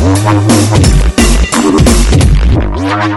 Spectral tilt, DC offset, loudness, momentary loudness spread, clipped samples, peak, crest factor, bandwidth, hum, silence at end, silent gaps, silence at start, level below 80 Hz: -5.5 dB/octave; under 0.1%; -8 LUFS; 4 LU; 0.7%; 0 dBFS; 6 dB; 12 kHz; none; 0 s; none; 0 s; -12 dBFS